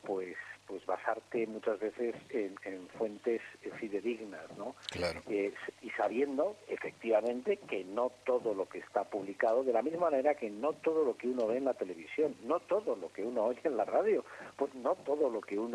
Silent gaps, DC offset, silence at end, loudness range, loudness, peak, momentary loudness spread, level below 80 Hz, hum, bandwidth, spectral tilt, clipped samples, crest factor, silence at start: none; under 0.1%; 0 s; 5 LU; -35 LUFS; -16 dBFS; 10 LU; -74 dBFS; none; 12 kHz; -5.5 dB/octave; under 0.1%; 18 dB; 0.05 s